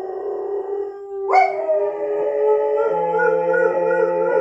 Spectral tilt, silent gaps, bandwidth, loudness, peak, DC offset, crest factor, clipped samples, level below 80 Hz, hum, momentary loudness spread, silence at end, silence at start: -6.5 dB/octave; none; 7.4 kHz; -19 LUFS; -4 dBFS; under 0.1%; 16 dB; under 0.1%; -68 dBFS; none; 10 LU; 0 s; 0 s